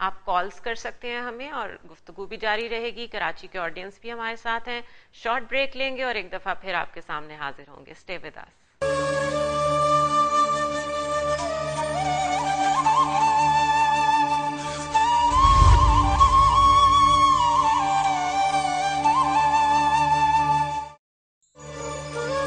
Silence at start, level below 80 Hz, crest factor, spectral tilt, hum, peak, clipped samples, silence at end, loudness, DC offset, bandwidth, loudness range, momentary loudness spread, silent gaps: 0 s; -34 dBFS; 20 dB; -4 dB/octave; none; -2 dBFS; under 0.1%; 0 s; -22 LUFS; under 0.1%; 10 kHz; 12 LU; 17 LU; 20.99-21.41 s